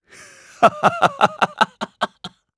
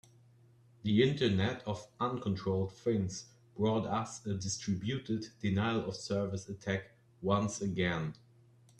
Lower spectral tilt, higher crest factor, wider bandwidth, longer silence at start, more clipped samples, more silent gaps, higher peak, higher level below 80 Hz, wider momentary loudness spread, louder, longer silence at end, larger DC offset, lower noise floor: second, -4 dB/octave vs -5.5 dB/octave; about the same, 20 dB vs 20 dB; about the same, 11 kHz vs 10.5 kHz; second, 0.6 s vs 0.85 s; neither; neither; first, 0 dBFS vs -14 dBFS; about the same, -62 dBFS vs -66 dBFS; about the same, 11 LU vs 10 LU; first, -19 LUFS vs -35 LUFS; second, 0.3 s vs 0.65 s; neither; second, -45 dBFS vs -63 dBFS